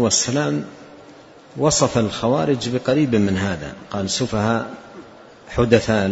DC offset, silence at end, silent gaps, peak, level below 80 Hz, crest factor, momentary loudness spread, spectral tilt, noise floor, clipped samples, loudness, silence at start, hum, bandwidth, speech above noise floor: under 0.1%; 0 s; none; 0 dBFS; -44 dBFS; 20 dB; 13 LU; -4.5 dB/octave; -44 dBFS; under 0.1%; -20 LUFS; 0 s; none; 8 kHz; 25 dB